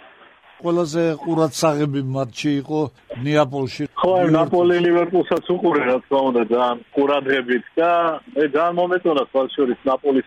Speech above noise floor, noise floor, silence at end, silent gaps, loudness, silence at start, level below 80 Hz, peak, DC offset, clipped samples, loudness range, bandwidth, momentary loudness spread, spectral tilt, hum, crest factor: 30 dB; -48 dBFS; 0.05 s; none; -19 LUFS; 0.6 s; -62 dBFS; -4 dBFS; under 0.1%; under 0.1%; 3 LU; 14 kHz; 6 LU; -6 dB/octave; none; 14 dB